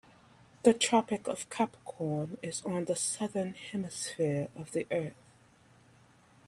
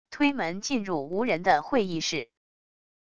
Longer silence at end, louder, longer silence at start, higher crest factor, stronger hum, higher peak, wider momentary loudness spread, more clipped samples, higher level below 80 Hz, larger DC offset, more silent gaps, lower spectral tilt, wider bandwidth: first, 1.35 s vs 0.65 s; second, -33 LUFS vs -27 LUFS; first, 0.65 s vs 0.05 s; about the same, 24 dB vs 20 dB; neither; about the same, -10 dBFS vs -8 dBFS; first, 10 LU vs 7 LU; neither; second, -72 dBFS vs -62 dBFS; second, under 0.1% vs 0.5%; neither; about the same, -4 dB/octave vs -4 dB/octave; first, 14 kHz vs 10 kHz